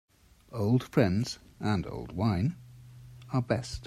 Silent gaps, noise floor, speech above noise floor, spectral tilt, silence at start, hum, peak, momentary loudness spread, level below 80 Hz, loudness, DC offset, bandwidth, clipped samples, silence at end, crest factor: none; -50 dBFS; 21 dB; -7 dB/octave; 0.5 s; none; -10 dBFS; 21 LU; -54 dBFS; -30 LUFS; under 0.1%; 13.5 kHz; under 0.1%; 0 s; 22 dB